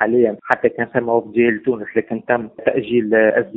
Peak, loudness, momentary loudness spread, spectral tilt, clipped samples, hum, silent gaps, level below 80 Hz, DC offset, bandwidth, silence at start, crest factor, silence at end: 0 dBFS; -18 LUFS; 7 LU; -5 dB/octave; under 0.1%; none; none; -58 dBFS; under 0.1%; 4 kHz; 0 s; 18 dB; 0 s